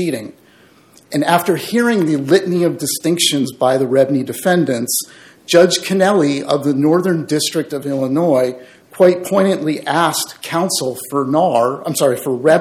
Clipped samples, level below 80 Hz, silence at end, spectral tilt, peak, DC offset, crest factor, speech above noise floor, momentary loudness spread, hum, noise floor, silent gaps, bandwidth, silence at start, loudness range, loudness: under 0.1%; -64 dBFS; 0 s; -4.5 dB/octave; 0 dBFS; under 0.1%; 16 dB; 33 dB; 7 LU; none; -48 dBFS; none; 17 kHz; 0 s; 2 LU; -15 LUFS